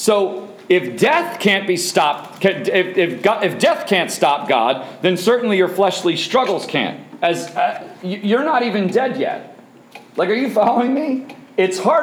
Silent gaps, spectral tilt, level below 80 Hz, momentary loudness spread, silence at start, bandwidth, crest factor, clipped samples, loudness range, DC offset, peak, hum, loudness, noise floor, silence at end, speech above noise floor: none; -4 dB/octave; -68 dBFS; 8 LU; 0 s; 17 kHz; 16 dB; under 0.1%; 3 LU; under 0.1%; -2 dBFS; none; -17 LUFS; -42 dBFS; 0 s; 25 dB